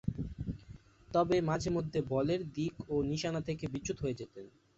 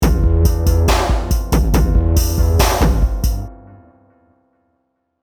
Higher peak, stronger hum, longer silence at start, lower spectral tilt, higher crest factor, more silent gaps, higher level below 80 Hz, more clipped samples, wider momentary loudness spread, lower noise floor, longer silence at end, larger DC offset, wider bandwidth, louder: second, -18 dBFS vs 0 dBFS; neither; about the same, 0.05 s vs 0 s; about the same, -6.5 dB/octave vs -5.5 dB/octave; about the same, 18 dB vs 16 dB; neither; second, -54 dBFS vs -18 dBFS; neither; first, 12 LU vs 6 LU; second, -55 dBFS vs -68 dBFS; second, 0.3 s vs 1.65 s; neither; second, 8 kHz vs over 20 kHz; second, -35 LUFS vs -16 LUFS